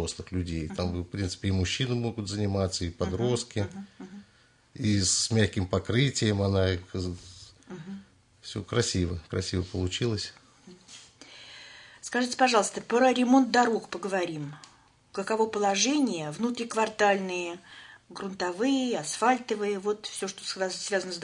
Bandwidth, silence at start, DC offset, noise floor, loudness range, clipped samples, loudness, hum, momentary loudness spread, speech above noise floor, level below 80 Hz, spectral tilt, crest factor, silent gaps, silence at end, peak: 11 kHz; 0 s; under 0.1%; -62 dBFS; 6 LU; under 0.1%; -28 LUFS; none; 21 LU; 34 dB; -58 dBFS; -4.5 dB/octave; 22 dB; none; 0 s; -8 dBFS